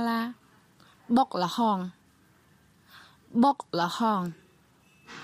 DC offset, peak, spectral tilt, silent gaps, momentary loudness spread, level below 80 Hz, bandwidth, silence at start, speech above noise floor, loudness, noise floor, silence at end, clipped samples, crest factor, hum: under 0.1%; -12 dBFS; -5.5 dB/octave; none; 13 LU; -72 dBFS; 15.5 kHz; 0 s; 36 dB; -27 LUFS; -62 dBFS; 0 s; under 0.1%; 18 dB; none